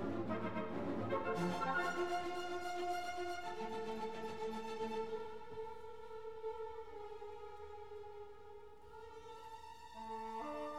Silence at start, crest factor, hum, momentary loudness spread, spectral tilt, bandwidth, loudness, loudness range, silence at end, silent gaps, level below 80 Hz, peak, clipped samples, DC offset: 0 s; 18 dB; none; 15 LU; -5.5 dB/octave; 17 kHz; -44 LUFS; 12 LU; 0 s; none; -70 dBFS; -26 dBFS; under 0.1%; 0.3%